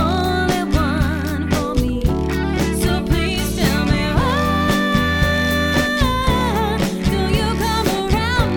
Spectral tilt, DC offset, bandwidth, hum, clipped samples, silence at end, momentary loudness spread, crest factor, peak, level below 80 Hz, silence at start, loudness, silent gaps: -5.5 dB/octave; under 0.1%; 18.5 kHz; none; under 0.1%; 0 s; 3 LU; 16 dB; -2 dBFS; -24 dBFS; 0 s; -18 LUFS; none